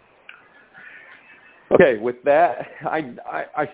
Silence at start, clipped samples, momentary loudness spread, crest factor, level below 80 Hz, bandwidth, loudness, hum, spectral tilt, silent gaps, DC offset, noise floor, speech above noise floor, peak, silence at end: 0.95 s; under 0.1%; 23 LU; 22 dB; -56 dBFS; 4 kHz; -20 LUFS; none; -10 dB/octave; none; under 0.1%; -49 dBFS; 30 dB; 0 dBFS; 0 s